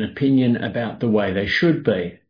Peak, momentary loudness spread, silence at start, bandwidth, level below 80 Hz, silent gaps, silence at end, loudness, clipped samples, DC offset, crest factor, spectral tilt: -4 dBFS; 5 LU; 0 s; 5.2 kHz; -50 dBFS; none; 0.15 s; -20 LUFS; under 0.1%; under 0.1%; 14 dB; -8 dB/octave